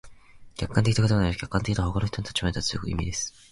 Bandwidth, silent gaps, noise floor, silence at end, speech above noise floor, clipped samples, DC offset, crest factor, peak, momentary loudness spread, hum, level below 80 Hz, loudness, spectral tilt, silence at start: 11.5 kHz; none; -47 dBFS; 0.25 s; 22 dB; under 0.1%; under 0.1%; 18 dB; -10 dBFS; 8 LU; none; -38 dBFS; -26 LUFS; -5 dB/octave; 0.05 s